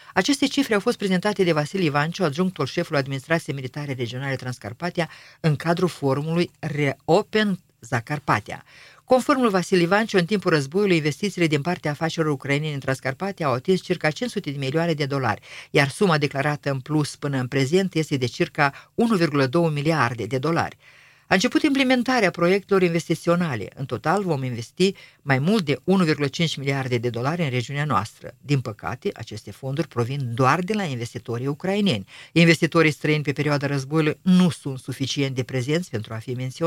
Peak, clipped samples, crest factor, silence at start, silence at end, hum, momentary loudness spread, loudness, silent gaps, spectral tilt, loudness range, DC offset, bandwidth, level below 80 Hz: 0 dBFS; under 0.1%; 22 dB; 0.05 s; 0 s; none; 10 LU; -23 LUFS; none; -6 dB/octave; 5 LU; under 0.1%; 16 kHz; -60 dBFS